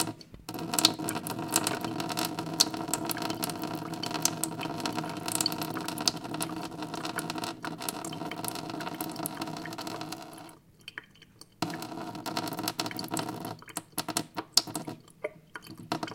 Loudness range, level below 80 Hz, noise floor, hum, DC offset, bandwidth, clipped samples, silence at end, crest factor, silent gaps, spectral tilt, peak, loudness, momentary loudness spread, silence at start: 9 LU; -68 dBFS; -55 dBFS; none; under 0.1%; 17 kHz; under 0.1%; 0 s; 32 dB; none; -2.5 dB/octave; -2 dBFS; -32 LUFS; 15 LU; 0 s